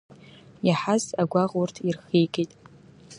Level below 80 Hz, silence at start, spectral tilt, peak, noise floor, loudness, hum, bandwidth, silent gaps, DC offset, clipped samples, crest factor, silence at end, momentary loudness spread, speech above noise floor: -68 dBFS; 0.65 s; -6 dB/octave; -8 dBFS; -50 dBFS; -25 LUFS; none; 11 kHz; none; under 0.1%; under 0.1%; 18 dB; 0 s; 7 LU; 26 dB